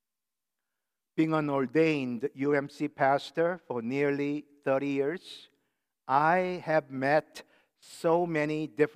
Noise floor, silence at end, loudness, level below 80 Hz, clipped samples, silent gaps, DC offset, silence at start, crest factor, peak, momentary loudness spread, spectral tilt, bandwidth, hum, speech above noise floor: under -90 dBFS; 0.05 s; -29 LUFS; -84 dBFS; under 0.1%; none; under 0.1%; 1.15 s; 18 dB; -10 dBFS; 10 LU; -7 dB/octave; 13.5 kHz; none; over 61 dB